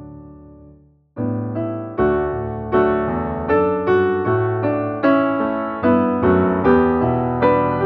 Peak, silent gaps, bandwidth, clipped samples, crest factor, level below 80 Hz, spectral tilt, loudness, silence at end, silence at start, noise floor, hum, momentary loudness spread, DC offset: -2 dBFS; none; 4.9 kHz; under 0.1%; 16 dB; -42 dBFS; -7 dB/octave; -18 LUFS; 0 s; 0 s; -49 dBFS; none; 9 LU; under 0.1%